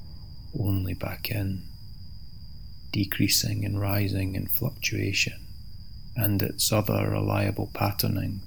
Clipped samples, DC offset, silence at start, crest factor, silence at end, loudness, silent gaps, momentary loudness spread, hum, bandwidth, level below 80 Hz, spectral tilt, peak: under 0.1%; 0.9%; 0 s; 20 dB; 0 s; -27 LUFS; none; 22 LU; none; over 20 kHz; -46 dBFS; -4.5 dB/octave; -8 dBFS